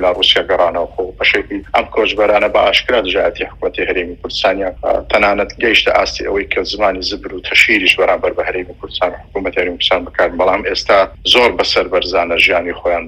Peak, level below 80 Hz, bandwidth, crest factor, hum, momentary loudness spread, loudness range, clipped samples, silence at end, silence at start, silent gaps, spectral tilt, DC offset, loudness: 0 dBFS; -36 dBFS; 19.5 kHz; 14 dB; none; 9 LU; 2 LU; 0.1%; 0 s; 0 s; none; -3 dB/octave; under 0.1%; -13 LUFS